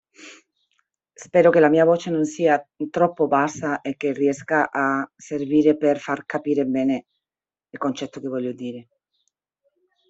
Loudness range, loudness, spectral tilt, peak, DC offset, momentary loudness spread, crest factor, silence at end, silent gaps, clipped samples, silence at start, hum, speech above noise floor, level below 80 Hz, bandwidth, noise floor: 7 LU; -21 LUFS; -6 dB/octave; -2 dBFS; under 0.1%; 13 LU; 20 dB; 1.25 s; none; under 0.1%; 0.2 s; none; over 69 dB; -66 dBFS; 8 kHz; under -90 dBFS